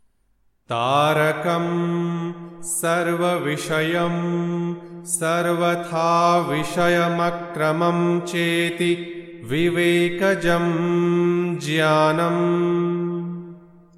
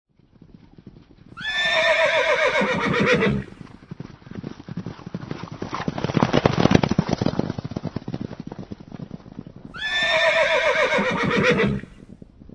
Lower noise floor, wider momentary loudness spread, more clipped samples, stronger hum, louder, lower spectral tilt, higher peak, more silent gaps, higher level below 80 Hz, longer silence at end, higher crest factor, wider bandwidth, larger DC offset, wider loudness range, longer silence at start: first, -63 dBFS vs -50 dBFS; second, 9 LU vs 20 LU; neither; neither; about the same, -21 LUFS vs -20 LUFS; about the same, -5 dB/octave vs -5.5 dB/octave; second, -6 dBFS vs 0 dBFS; neither; second, -56 dBFS vs -46 dBFS; about the same, 0.4 s vs 0.4 s; second, 16 dB vs 24 dB; first, 14.5 kHz vs 10.5 kHz; neither; second, 3 LU vs 6 LU; second, 0.7 s vs 0.85 s